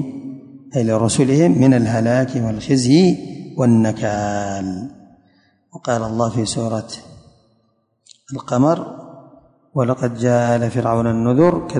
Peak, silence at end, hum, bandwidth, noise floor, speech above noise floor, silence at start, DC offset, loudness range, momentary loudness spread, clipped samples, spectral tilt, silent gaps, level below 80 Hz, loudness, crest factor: -2 dBFS; 0 s; none; 10.5 kHz; -63 dBFS; 47 dB; 0 s; under 0.1%; 9 LU; 18 LU; under 0.1%; -6.5 dB/octave; none; -48 dBFS; -17 LUFS; 16 dB